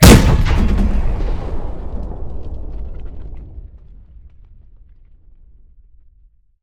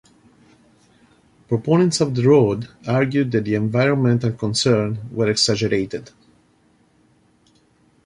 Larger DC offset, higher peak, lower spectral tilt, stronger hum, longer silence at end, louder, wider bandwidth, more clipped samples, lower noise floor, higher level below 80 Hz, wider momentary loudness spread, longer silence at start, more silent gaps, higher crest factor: neither; about the same, 0 dBFS vs -2 dBFS; about the same, -5.5 dB/octave vs -5.5 dB/octave; neither; about the same, 2.1 s vs 2 s; about the same, -18 LUFS vs -19 LUFS; first, 18 kHz vs 11.5 kHz; first, 0.7% vs under 0.1%; second, -50 dBFS vs -58 dBFS; first, -20 dBFS vs -54 dBFS; first, 21 LU vs 9 LU; second, 0 s vs 1.5 s; neither; about the same, 16 dB vs 18 dB